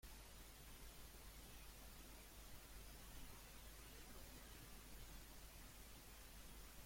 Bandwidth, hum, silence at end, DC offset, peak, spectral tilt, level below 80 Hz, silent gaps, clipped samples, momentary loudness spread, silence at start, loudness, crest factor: 16.5 kHz; none; 0 s; under 0.1%; -46 dBFS; -3 dB/octave; -62 dBFS; none; under 0.1%; 1 LU; 0 s; -60 LUFS; 14 dB